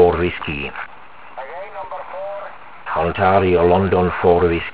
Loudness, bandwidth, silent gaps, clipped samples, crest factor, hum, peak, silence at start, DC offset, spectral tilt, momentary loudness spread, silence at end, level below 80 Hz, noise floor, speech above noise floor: -17 LUFS; 4 kHz; none; under 0.1%; 18 dB; none; 0 dBFS; 0 s; 1%; -10.5 dB/octave; 20 LU; 0.05 s; -36 dBFS; -41 dBFS; 25 dB